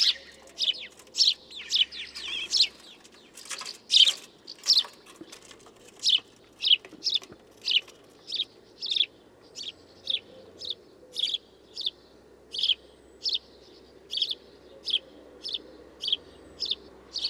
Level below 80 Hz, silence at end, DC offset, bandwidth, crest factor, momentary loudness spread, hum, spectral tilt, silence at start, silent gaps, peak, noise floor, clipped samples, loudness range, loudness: -68 dBFS; 0 s; under 0.1%; 19.5 kHz; 24 dB; 17 LU; none; 1.5 dB/octave; 0 s; none; -6 dBFS; -55 dBFS; under 0.1%; 8 LU; -26 LUFS